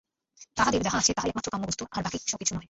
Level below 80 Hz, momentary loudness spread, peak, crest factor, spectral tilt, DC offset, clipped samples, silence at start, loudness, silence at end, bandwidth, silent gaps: -52 dBFS; 8 LU; -8 dBFS; 22 dB; -2.5 dB/octave; under 0.1%; under 0.1%; 0.4 s; -28 LUFS; 0.05 s; 8.2 kHz; none